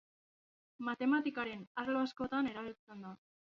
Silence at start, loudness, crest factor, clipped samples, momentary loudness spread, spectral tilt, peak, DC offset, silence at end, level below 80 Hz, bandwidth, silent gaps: 0.8 s; -38 LUFS; 18 dB; under 0.1%; 17 LU; -3 dB/octave; -22 dBFS; under 0.1%; 0.45 s; -74 dBFS; 7 kHz; 1.67-1.75 s, 2.79-2.87 s